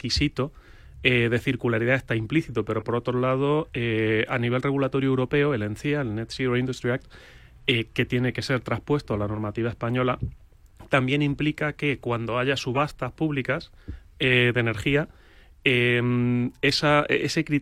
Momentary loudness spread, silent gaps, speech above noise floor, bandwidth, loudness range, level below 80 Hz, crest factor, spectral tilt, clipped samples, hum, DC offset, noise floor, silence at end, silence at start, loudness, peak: 8 LU; none; 25 dB; 13.5 kHz; 4 LU; -48 dBFS; 20 dB; -6 dB/octave; under 0.1%; none; under 0.1%; -49 dBFS; 0 s; 0.05 s; -24 LUFS; -4 dBFS